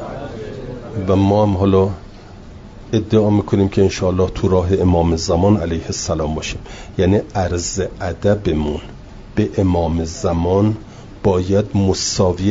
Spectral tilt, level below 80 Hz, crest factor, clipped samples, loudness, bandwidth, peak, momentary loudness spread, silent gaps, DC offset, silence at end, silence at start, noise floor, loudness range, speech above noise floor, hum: -6 dB/octave; -36 dBFS; 14 dB; under 0.1%; -17 LUFS; 7.8 kHz; -2 dBFS; 14 LU; none; under 0.1%; 0 s; 0 s; -36 dBFS; 4 LU; 20 dB; none